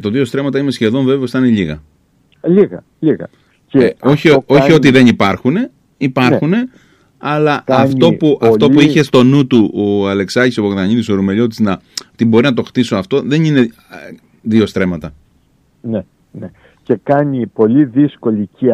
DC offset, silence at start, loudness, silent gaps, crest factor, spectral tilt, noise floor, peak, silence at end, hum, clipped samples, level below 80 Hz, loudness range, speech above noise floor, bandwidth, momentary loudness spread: under 0.1%; 0 s; -12 LUFS; none; 12 dB; -7 dB/octave; -54 dBFS; 0 dBFS; 0 s; none; under 0.1%; -48 dBFS; 6 LU; 42 dB; 13 kHz; 13 LU